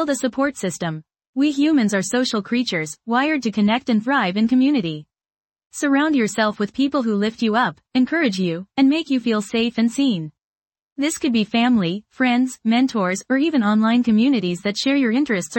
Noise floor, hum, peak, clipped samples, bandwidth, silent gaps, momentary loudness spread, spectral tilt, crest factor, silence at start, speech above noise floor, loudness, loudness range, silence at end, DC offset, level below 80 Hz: under -90 dBFS; none; -6 dBFS; under 0.1%; 17 kHz; 1.27-1.33 s, 5.38-5.50 s, 10.44-10.62 s, 10.82-10.96 s; 8 LU; -5 dB/octave; 14 dB; 0 s; over 71 dB; -20 LUFS; 2 LU; 0 s; under 0.1%; -62 dBFS